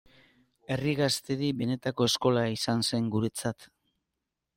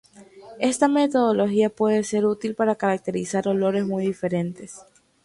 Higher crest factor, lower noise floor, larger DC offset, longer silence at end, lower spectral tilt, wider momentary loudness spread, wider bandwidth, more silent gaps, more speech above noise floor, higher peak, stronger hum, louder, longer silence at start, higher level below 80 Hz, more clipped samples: about the same, 18 dB vs 18 dB; first, -85 dBFS vs -46 dBFS; neither; first, 0.9 s vs 0.4 s; about the same, -5 dB/octave vs -5.5 dB/octave; about the same, 9 LU vs 7 LU; first, 16.5 kHz vs 11.5 kHz; neither; first, 57 dB vs 24 dB; second, -12 dBFS vs -6 dBFS; neither; second, -29 LUFS vs -22 LUFS; first, 0.7 s vs 0.2 s; about the same, -64 dBFS vs -64 dBFS; neither